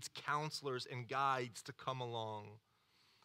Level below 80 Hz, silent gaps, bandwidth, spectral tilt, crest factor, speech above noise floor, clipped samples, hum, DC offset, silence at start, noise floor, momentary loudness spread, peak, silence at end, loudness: -88 dBFS; none; 16 kHz; -4 dB/octave; 20 dB; 32 dB; under 0.1%; none; under 0.1%; 0 s; -74 dBFS; 10 LU; -24 dBFS; 0.65 s; -42 LUFS